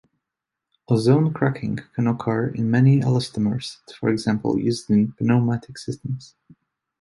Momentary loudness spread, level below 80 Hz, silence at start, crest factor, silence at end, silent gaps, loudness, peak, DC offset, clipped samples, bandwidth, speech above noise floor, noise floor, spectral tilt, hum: 13 LU; -56 dBFS; 0.9 s; 18 dB; 0.75 s; none; -22 LUFS; -4 dBFS; under 0.1%; under 0.1%; 11.5 kHz; 64 dB; -85 dBFS; -7.5 dB/octave; none